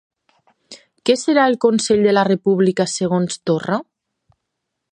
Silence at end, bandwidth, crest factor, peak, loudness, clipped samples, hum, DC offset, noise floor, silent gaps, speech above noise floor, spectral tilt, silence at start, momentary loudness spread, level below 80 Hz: 1.1 s; 10 kHz; 16 dB; -2 dBFS; -17 LUFS; under 0.1%; none; under 0.1%; -78 dBFS; none; 61 dB; -5 dB/octave; 0.7 s; 6 LU; -60 dBFS